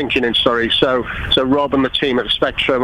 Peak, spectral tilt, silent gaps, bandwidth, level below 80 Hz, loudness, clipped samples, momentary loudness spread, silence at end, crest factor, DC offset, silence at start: 0 dBFS; -5.5 dB/octave; none; 11.5 kHz; -36 dBFS; -15 LUFS; under 0.1%; 3 LU; 0 s; 16 dB; under 0.1%; 0 s